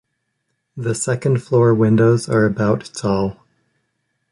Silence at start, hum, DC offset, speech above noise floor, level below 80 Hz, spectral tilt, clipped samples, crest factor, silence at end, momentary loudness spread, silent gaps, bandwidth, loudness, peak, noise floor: 0.75 s; none; under 0.1%; 56 dB; -50 dBFS; -6.5 dB/octave; under 0.1%; 16 dB; 1 s; 9 LU; none; 11.5 kHz; -17 LUFS; -4 dBFS; -72 dBFS